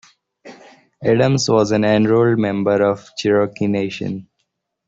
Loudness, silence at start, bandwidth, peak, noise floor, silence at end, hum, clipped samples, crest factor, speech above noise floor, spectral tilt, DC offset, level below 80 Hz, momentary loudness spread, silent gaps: -17 LUFS; 0.45 s; 8 kHz; -2 dBFS; -72 dBFS; 0.65 s; none; under 0.1%; 16 dB; 56 dB; -6 dB/octave; under 0.1%; -54 dBFS; 9 LU; none